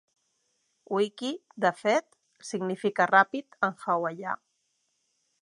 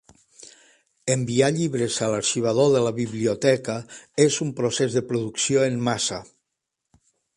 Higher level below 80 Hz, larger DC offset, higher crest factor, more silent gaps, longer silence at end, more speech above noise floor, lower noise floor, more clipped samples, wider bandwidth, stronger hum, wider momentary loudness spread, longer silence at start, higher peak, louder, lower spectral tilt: second, -84 dBFS vs -60 dBFS; neither; about the same, 24 dB vs 20 dB; neither; about the same, 1.1 s vs 1.15 s; second, 48 dB vs 59 dB; second, -76 dBFS vs -81 dBFS; neither; about the same, 11.5 kHz vs 11.5 kHz; neither; first, 14 LU vs 7 LU; first, 0.9 s vs 0.4 s; about the same, -6 dBFS vs -4 dBFS; second, -28 LUFS vs -23 LUFS; about the same, -4.5 dB/octave vs -4.5 dB/octave